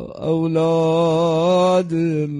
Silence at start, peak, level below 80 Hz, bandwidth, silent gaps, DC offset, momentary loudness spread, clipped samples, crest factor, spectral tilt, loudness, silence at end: 0 s; -6 dBFS; -54 dBFS; 11 kHz; none; under 0.1%; 5 LU; under 0.1%; 12 dB; -7.5 dB/octave; -18 LUFS; 0 s